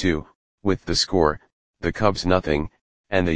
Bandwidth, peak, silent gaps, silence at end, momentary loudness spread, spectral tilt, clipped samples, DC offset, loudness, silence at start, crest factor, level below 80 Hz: 9.8 kHz; -2 dBFS; 0.35-0.58 s, 1.52-1.74 s, 2.81-3.04 s; 0 s; 9 LU; -5 dB/octave; under 0.1%; 1%; -23 LUFS; 0 s; 20 dB; -40 dBFS